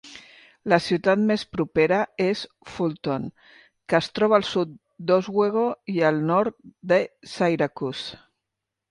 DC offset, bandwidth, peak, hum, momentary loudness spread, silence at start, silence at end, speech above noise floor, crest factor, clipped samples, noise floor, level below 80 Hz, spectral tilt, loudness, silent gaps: under 0.1%; 11.5 kHz; -4 dBFS; none; 13 LU; 0.05 s; 0.75 s; 61 dB; 20 dB; under 0.1%; -84 dBFS; -60 dBFS; -6 dB/octave; -23 LUFS; none